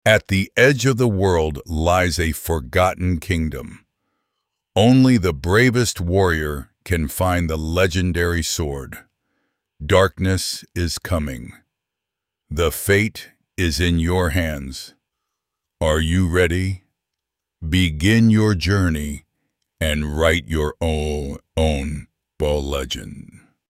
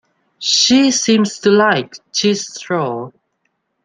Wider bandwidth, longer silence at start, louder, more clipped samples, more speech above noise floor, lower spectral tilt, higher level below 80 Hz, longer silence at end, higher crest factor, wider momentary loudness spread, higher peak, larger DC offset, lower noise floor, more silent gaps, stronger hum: first, 16 kHz vs 10 kHz; second, 0.05 s vs 0.4 s; second, -19 LUFS vs -14 LUFS; neither; first, 65 dB vs 54 dB; first, -5.5 dB/octave vs -3 dB/octave; first, -32 dBFS vs -62 dBFS; second, 0.35 s vs 0.75 s; about the same, 18 dB vs 16 dB; first, 15 LU vs 12 LU; about the same, -2 dBFS vs 0 dBFS; neither; first, -83 dBFS vs -69 dBFS; neither; neither